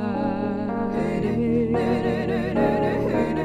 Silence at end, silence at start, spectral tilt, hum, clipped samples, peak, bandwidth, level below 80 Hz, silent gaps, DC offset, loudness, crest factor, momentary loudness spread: 0 s; 0 s; -8.5 dB/octave; none; under 0.1%; -10 dBFS; 9.8 kHz; -44 dBFS; none; under 0.1%; -23 LUFS; 14 dB; 4 LU